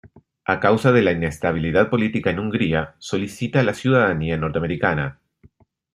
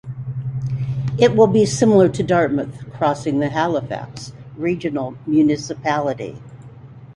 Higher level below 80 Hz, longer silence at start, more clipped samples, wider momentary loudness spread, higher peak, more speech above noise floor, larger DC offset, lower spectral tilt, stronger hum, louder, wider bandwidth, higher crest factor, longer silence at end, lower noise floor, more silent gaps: about the same, -46 dBFS vs -50 dBFS; about the same, 0.05 s vs 0.05 s; neither; second, 9 LU vs 15 LU; about the same, -2 dBFS vs -2 dBFS; first, 35 dB vs 22 dB; neither; about the same, -7 dB/octave vs -6.5 dB/octave; neither; about the same, -20 LUFS vs -19 LUFS; first, 13.5 kHz vs 11.5 kHz; about the same, 18 dB vs 18 dB; first, 0.8 s vs 0.05 s; first, -55 dBFS vs -39 dBFS; neither